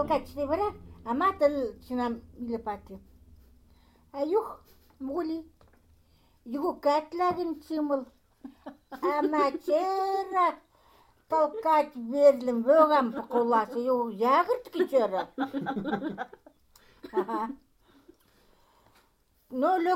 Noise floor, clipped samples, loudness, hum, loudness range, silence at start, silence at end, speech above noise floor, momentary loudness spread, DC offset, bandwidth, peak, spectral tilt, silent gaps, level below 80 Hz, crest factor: -67 dBFS; under 0.1%; -28 LUFS; none; 11 LU; 0 s; 0 s; 40 dB; 17 LU; under 0.1%; 16 kHz; -8 dBFS; -6 dB/octave; none; -60 dBFS; 20 dB